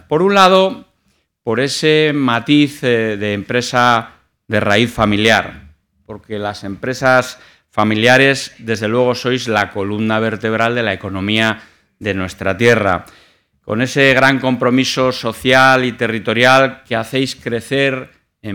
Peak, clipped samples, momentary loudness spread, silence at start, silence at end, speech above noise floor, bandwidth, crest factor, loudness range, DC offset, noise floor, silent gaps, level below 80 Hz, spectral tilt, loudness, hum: 0 dBFS; under 0.1%; 13 LU; 0.1 s; 0 s; 48 dB; 19 kHz; 16 dB; 4 LU; under 0.1%; -62 dBFS; none; -48 dBFS; -5 dB/octave; -14 LUFS; none